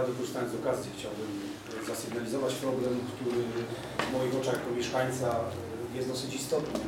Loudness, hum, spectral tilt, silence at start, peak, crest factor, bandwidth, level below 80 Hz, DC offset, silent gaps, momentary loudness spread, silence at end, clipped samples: -33 LUFS; none; -5 dB/octave; 0 s; -12 dBFS; 22 dB; 17 kHz; -62 dBFS; under 0.1%; none; 7 LU; 0 s; under 0.1%